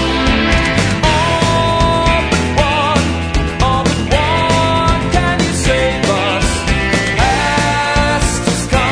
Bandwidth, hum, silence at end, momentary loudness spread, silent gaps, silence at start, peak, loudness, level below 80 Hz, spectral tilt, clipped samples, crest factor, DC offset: 11 kHz; none; 0 s; 2 LU; none; 0 s; 0 dBFS; -13 LUFS; -22 dBFS; -4.5 dB/octave; under 0.1%; 14 dB; under 0.1%